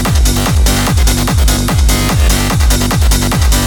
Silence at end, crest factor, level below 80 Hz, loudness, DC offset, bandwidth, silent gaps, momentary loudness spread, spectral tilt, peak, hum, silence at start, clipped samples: 0 s; 8 dB; -12 dBFS; -11 LUFS; under 0.1%; 19.5 kHz; none; 0 LU; -4 dB/octave; -2 dBFS; none; 0 s; under 0.1%